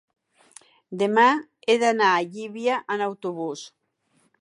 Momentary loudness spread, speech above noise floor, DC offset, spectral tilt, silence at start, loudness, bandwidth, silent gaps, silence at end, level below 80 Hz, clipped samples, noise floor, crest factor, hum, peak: 14 LU; 45 dB; under 0.1%; -4 dB/octave; 0.9 s; -23 LUFS; 11.5 kHz; none; 0.75 s; -80 dBFS; under 0.1%; -67 dBFS; 18 dB; none; -6 dBFS